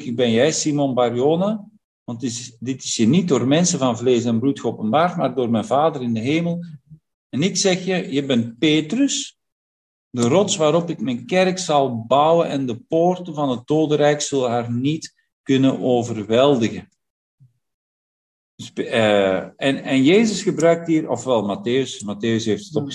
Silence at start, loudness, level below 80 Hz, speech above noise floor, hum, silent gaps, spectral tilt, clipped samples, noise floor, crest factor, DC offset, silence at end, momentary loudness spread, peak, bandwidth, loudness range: 0 s; -19 LUFS; -62 dBFS; over 71 dB; none; 1.84-2.06 s, 7.14-7.30 s, 9.52-10.11 s, 15.33-15.44 s, 17.10-17.38 s, 17.74-18.58 s; -5 dB/octave; under 0.1%; under -90 dBFS; 18 dB; under 0.1%; 0 s; 10 LU; -2 dBFS; 11.5 kHz; 3 LU